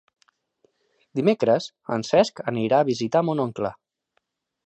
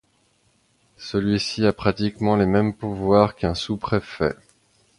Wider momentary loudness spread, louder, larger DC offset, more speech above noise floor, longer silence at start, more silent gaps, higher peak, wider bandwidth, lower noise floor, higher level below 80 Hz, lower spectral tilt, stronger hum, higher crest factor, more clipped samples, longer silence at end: about the same, 9 LU vs 8 LU; about the same, -23 LUFS vs -22 LUFS; neither; first, 51 dB vs 42 dB; first, 1.15 s vs 1 s; neither; second, -6 dBFS vs -2 dBFS; second, 8.8 kHz vs 11 kHz; first, -73 dBFS vs -64 dBFS; second, -64 dBFS vs -44 dBFS; about the same, -6 dB/octave vs -6.5 dB/octave; neither; about the same, 20 dB vs 22 dB; neither; first, 0.95 s vs 0.65 s